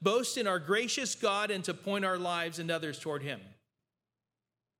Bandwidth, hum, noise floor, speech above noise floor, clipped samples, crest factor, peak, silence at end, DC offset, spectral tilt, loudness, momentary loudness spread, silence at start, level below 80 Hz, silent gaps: 17 kHz; none; under -90 dBFS; over 57 dB; under 0.1%; 20 dB; -14 dBFS; 1.3 s; under 0.1%; -3 dB/octave; -32 LUFS; 8 LU; 0 s; -86 dBFS; none